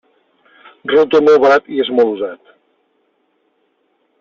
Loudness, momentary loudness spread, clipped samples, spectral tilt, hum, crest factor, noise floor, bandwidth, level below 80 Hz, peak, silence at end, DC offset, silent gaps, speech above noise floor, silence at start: -13 LUFS; 15 LU; under 0.1%; -5.5 dB/octave; none; 14 dB; -63 dBFS; 7 kHz; -60 dBFS; -2 dBFS; 1.85 s; under 0.1%; none; 50 dB; 0.85 s